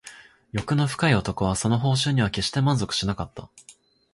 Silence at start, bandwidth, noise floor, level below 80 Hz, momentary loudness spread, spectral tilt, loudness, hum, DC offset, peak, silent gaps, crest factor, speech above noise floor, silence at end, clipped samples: 0.05 s; 11.5 kHz; -47 dBFS; -46 dBFS; 11 LU; -5 dB/octave; -24 LUFS; none; under 0.1%; -6 dBFS; none; 18 dB; 24 dB; 0.4 s; under 0.1%